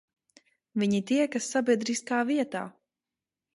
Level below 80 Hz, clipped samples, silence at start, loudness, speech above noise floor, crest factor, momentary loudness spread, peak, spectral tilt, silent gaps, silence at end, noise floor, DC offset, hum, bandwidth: -74 dBFS; under 0.1%; 0.75 s; -28 LUFS; over 63 dB; 18 dB; 10 LU; -12 dBFS; -4.5 dB/octave; none; 0.85 s; under -90 dBFS; under 0.1%; none; 11.5 kHz